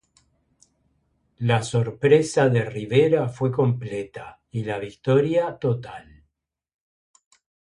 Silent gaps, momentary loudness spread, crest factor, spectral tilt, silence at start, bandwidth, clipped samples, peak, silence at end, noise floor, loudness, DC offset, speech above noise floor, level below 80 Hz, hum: none; 14 LU; 20 dB; -6.5 dB/octave; 1.4 s; 11 kHz; under 0.1%; -4 dBFS; 1.75 s; -80 dBFS; -22 LUFS; under 0.1%; 58 dB; -58 dBFS; none